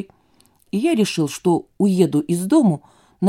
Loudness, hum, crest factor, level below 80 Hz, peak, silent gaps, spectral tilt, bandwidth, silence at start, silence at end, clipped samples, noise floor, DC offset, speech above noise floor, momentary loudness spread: -19 LUFS; none; 16 dB; -64 dBFS; -2 dBFS; none; -6.5 dB/octave; 16 kHz; 0 s; 0 s; under 0.1%; -57 dBFS; under 0.1%; 39 dB; 9 LU